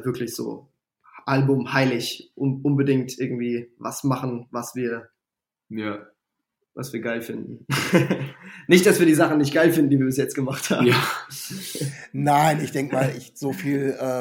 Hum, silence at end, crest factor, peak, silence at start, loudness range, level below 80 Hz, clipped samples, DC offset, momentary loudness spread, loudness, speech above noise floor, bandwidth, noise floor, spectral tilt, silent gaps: none; 0 s; 22 dB; 0 dBFS; 0 s; 11 LU; -66 dBFS; under 0.1%; under 0.1%; 15 LU; -22 LUFS; 66 dB; 17 kHz; -88 dBFS; -5.5 dB/octave; none